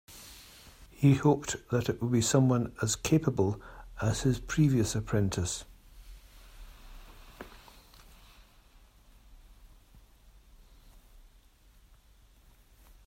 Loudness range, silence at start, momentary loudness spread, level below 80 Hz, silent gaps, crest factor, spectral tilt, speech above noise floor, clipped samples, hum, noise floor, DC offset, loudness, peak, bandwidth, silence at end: 10 LU; 0.1 s; 24 LU; -52 dBFS; none; 20 dB; -5.5 dB/octave; 32 dB; under 0.1%; none; -60 dBFS; under 0.1%; -29 LUFS; -12 dBFS; 16 kHz; 3.7 s